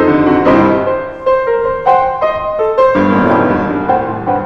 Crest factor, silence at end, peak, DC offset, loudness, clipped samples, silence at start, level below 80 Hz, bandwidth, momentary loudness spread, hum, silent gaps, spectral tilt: 12 dB; 0 s; 0 dBFS; under 0.1%; -12 LUFS; under 0.1%; 0 s; -38 dBFS; 6.6 kHz; 6 LU; none; none; -8.5 dB/octave